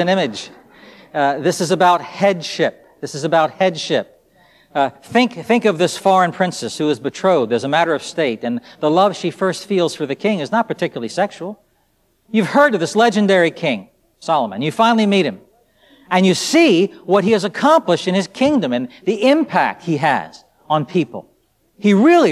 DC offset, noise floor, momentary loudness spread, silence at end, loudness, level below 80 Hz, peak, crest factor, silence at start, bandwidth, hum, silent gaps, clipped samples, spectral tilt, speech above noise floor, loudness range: under 0.1%; -61 dBFS; 9 LU; 0 s; -17 LUFS; -64 dBFS; -2 dBFS; 16 dB; 0 s; 14 kHz; none; none; under 0.1%; -5 dB/octave; 45 dB; 4 LU